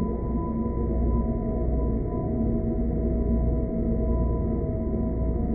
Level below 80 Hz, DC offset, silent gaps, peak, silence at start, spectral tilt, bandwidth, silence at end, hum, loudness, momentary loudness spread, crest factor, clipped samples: -28 dBFS; under 0.1%; none; -12 dBFS; 0 s; -15.5 dB/octave; 2.3 kHz; 0 s; none; -27 LUFS; 2 LU; 12 dB; under 0.1%